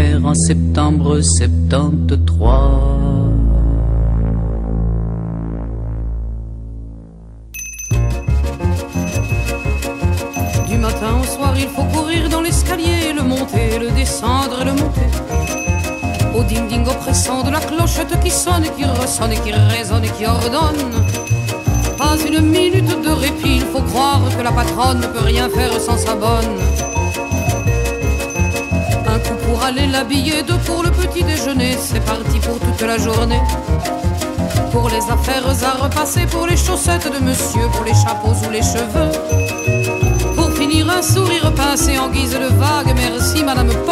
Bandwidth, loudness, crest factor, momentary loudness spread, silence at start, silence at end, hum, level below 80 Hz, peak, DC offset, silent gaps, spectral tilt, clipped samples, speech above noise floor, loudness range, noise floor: 16 kHz; -16 LUFS; 14 dB; 6 LU; 0 s; 0 s; none; -22 dBFS; -2 dBFS; under 0.1%; none; -5 dB/octave; under 0.1%; 21 dB; 5 LU; -35 dBFS